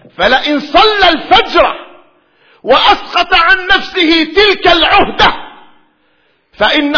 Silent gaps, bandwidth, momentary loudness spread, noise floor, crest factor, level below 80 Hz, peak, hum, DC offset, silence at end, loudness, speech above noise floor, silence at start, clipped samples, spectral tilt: none; 5.4 kHz; 4 LU; -55 dBFS; 10 dB; -32 dBFS; 0 dBFS; none; under 0.1%; 0 s; -8 LUFS; 46 dB; 0.2 s; 0.7%; -3.5 dB/octave